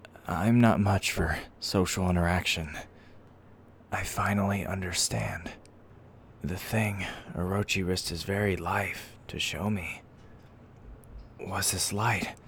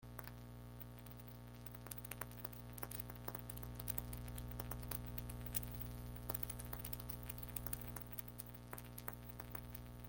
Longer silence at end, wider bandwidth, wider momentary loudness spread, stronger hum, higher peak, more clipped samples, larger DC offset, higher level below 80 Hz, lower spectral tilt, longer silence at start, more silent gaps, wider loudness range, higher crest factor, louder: about the same, 0 s vs 0 s; first, over 20 kHz vs 17 kHz; first, 14 LU vs 10 LU; second, none vs 60 Hz at -50 dBFS; first, -8 dBFS vs -18 dBFS; neither; neither; first, -48 dBFS vs -56 dBFS; about the same, -4.5 dB/octave vs -4.5 dB/octave; about the same, 0 s vs 0 s; neither; about the same, 5 LU vs 4 LU; second, 22 dB vs 30 dB; first, -29 LUFS vs -48 LUFS